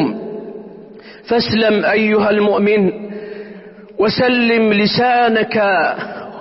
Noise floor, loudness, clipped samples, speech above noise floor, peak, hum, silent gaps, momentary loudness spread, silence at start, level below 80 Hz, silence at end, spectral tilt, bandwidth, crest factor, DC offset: -37 dBFS; -14 LUFS; under 0.1%; 23 dB; -4 dBFS; none; none; 18 LU; 0 s; -52 dBFS; 0 s; -9.5 dB/octave; 5.8 kHz; 12 dB; under 0.1%